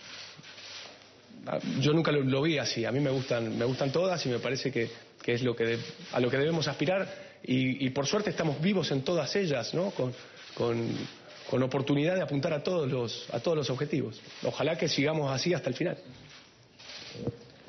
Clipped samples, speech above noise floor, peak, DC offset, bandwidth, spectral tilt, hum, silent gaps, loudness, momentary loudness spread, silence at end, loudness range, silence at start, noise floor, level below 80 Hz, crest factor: under 0.1%; 25 dB; -16 dBFS; under 0.1%; 6.4 kHz; -5 dB/octave; none; none; -30 LUFS; 15 LU; 0.05 s; 2 LU; 0 s; -55 dBFS; -66 dBFS; 16 dB